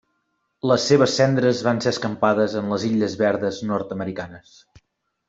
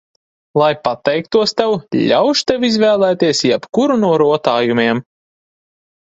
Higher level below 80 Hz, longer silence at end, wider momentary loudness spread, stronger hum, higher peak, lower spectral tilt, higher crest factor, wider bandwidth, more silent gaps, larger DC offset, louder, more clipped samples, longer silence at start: about the same, -60 dBFS vs -56 dBFS; second, 0.9 s vs 1.1 s; first, 11 LU vs 5 LU; neither; about the same, -2 dBFS vs 0 dBFS; about the same, -5.5 dB/octave vs -5 dB/octave; about the same, 18 dB vs 16 dB; about the same, 8 kHz vs 8 kHz; neither; neither; second, -21 LUFS vs -14 LUFS; neither; about the same, 0.65 s vs 0.55 s